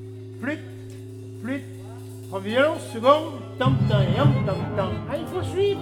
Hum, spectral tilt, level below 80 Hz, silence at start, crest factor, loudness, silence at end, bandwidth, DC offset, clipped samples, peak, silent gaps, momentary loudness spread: none; -7 dB/octave; -48 dBFS; 0 s; 20 dB; -24 LUFS; 0 s; 13 kHz; under 0.1%; under 0.1%; -4 dBFS; none; 19 LU